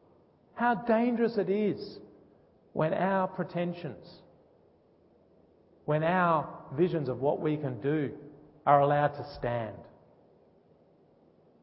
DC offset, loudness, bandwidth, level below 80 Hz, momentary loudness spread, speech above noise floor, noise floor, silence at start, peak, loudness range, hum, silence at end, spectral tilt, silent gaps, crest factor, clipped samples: under 0.1%; -30 LUFS; 5.8 kHz; -66 dBFS; 16 LU; 34 dB; -63 dBFS; 0.55 s; -10 dBFS; 6 LU; none; 1.75 s; -11 dB/octave; none; 22 dB; under 0.1%